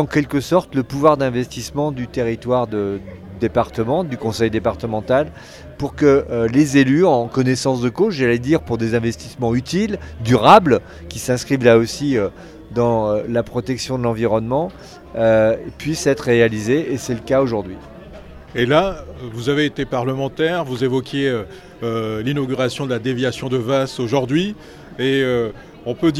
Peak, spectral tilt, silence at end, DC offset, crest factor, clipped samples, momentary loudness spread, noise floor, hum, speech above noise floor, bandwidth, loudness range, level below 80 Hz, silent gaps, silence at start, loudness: 0 dBFS; -6 dB/octave; 0 s; under 0.1%; 18 dB; under 0.1%; 12 LU; -37 dBFS; none; 20 dB; 14 kHz; 5 LU; -42 dBFS; none; 0 s; -18 LUFS